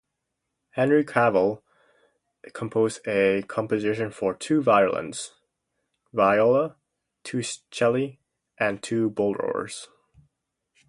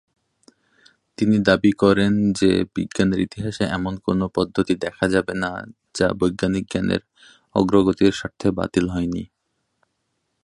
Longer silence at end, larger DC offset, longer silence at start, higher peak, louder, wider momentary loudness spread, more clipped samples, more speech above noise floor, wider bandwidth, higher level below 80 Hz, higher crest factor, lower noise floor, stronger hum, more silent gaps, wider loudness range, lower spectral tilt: second, 1.05 s vs 1.2 s; neither; second, 0.75 s vs 1.2 s; about the same, -4 dBFS vs -2 dBFS; second, -24 LUFS vs -21 LUFS; first, 15 LU vs 10 LU; neither; first, 58 dB vs 54 dB; about the same, 11.5 kHz vs 11 kHz; second, -64 dBFS vs -46 dBFS; about the same, 22 dB vs 20 dB; first, -81 dBFS vs -74 dBFS; neither; neither; about the same, 4 LU vs 3 LU; about the same, -5.5 dB/octave vs -6 dB/octave